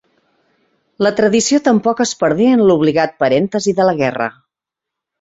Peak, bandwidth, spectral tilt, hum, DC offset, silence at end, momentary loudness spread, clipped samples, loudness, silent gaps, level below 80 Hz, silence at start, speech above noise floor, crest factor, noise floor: 0 dBFS; 8 kHz; -5 dB/octave; none; under 0.1%; 0.9 s; 6 LU; under 0.1%; -14 LUFS; none; -56 dBFS; 1 s; 70 dB; 14 dB; -84 dBFS